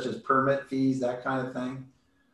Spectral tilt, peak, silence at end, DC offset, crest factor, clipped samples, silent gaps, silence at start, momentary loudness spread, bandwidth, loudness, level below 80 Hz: -7 dB/octave; -12 dBFS; 0.45 s; under 0.1%; 18 dB; under 0.1%; none; 0 s; 11 LU; 10.5 kHz; -28 LUFS; -68 dBFS